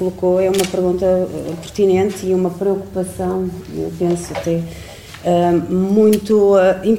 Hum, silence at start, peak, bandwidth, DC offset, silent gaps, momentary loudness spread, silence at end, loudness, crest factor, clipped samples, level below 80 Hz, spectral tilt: none; 0 s; 0 dBFS; 16.5 kHz; under 0.1%; none; 12 LU; 0 s; -17 LUFS; 16 dB; under 0.1%; -42 dBFS; -6.5 dB/octave